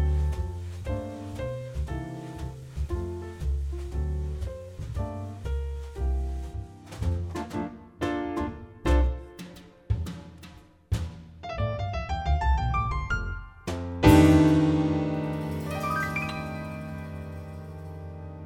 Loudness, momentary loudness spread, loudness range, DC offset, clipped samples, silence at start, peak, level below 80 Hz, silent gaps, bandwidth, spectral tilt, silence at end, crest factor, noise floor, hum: -29 LUFS; 15 LU; 11 LU; under 0.1%; under 0.1%; 0 s; -6 dBFS; -34 dBFS; none; 16 kHz; -7 dB/octave; 0 s; 22 dB; -49 dBFS; none